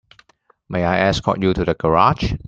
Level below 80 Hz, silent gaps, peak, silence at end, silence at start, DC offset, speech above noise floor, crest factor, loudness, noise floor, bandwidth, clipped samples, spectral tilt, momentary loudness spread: -36 dBFS; none; -2 dBFS; 0 s; 0.7 s; under 0.1%; 40 dB; 18 dB; -18 LUFS; -58 dBFS; 7.8 kHz; under 0.1%; -6.5 dB/octave; 6 LU